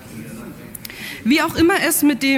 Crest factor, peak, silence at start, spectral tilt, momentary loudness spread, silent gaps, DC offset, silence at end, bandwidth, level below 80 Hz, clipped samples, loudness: 14 dB; -6 dBFS; 0 s; -3 dB/octave; 19 LU; none; under 0.1%; 0 s; 17 kHz; -46 dBFS; under 0.1%; -16 LUFS